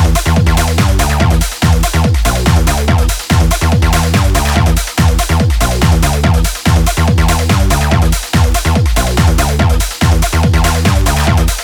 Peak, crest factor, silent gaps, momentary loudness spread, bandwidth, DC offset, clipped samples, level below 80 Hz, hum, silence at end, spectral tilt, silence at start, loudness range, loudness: 0 dBFS; 10 dB; none; 1 LU; 19.5 kHz; under 0.1%; under 0.1%; -14 dBFS; none; 0 s; -5 dB/octave; 0 s; 0 LU; -12 LUFS